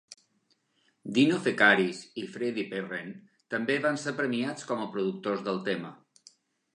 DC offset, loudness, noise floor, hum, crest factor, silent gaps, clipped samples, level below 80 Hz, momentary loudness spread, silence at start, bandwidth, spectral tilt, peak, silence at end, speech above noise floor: under 0.1%; -29 LUFS; -72 dBFS; none; 24 dB; none; under 0.1%; -80 dBFS; 16 LU; 0.1 s; 10.5 kHz; -5 dB/octave; -8 dBFS; 0.8 s; 44 dB